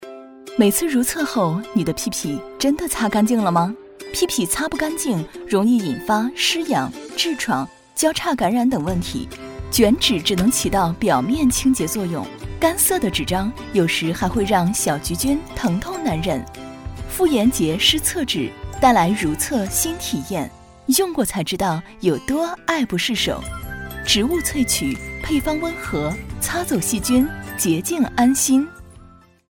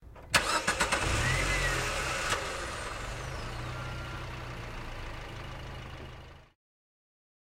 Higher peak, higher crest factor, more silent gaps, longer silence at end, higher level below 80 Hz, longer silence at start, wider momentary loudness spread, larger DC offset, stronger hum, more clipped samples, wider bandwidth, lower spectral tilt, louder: first, -2 dBFS vs -8 dBFS; second, 18 dB vs 26 dB; neither; second, 0.4 s vs 1.1 s; about the same, -38 dBFS vs -42 dBFS; about the same, 0 s vs 0 s; second, 10 LU vs 15 LU; neither; neither; neither; first, over 20 kHz vs 16 kHz; about the same, -3.5 dB/octave vs -3 dB/octave; first, -20 LUFS vs -32 LUFS